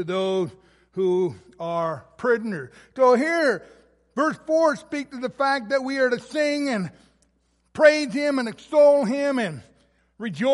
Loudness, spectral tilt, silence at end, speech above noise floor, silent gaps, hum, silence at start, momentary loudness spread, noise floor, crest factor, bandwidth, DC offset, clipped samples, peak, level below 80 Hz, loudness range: -22 LUFS; -5 dB/octave; 0 s; 45 dB; none; none; 0 s; 16 LU; -67 dBFS; 20 dB; 11.5 kHz; under 0.1%; under 0.1%; -4 dBFS; -66 dBFS; 3 LU